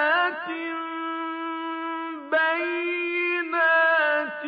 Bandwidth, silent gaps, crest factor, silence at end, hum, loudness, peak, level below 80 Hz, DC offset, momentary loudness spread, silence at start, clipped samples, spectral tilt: 5.2 kHz; none; 14 dB; 0 s; none; -24 LUFS; -12 dBFS; -86 dBFS; under 0.1%; 11 LU; 0 s; under 0.1%; -5 dB/octave